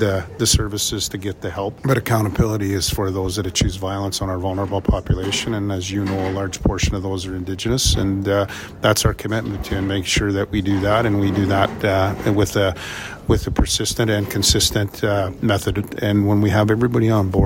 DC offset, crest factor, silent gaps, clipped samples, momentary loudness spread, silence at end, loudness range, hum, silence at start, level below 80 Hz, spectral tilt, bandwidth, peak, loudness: under 0.1%; 18 dB; none; under 0.1%; 7 LU; 0 s; 3 LU; none; 0 s; -32 dBFS; -4.5 dB/octave; 16.5 kHz; -2 dBFS; -20 LUFS